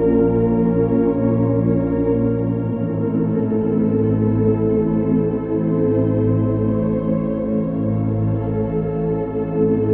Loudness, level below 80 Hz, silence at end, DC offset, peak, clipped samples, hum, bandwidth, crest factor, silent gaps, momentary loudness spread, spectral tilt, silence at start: -19 LUFS; -38 dBFS; 0 s; under 0.1%; -6 dBFS; under 0.1%; none; 3.3 kHz; 12 dB; none; 4 LU; -14 dB/octave; 0 s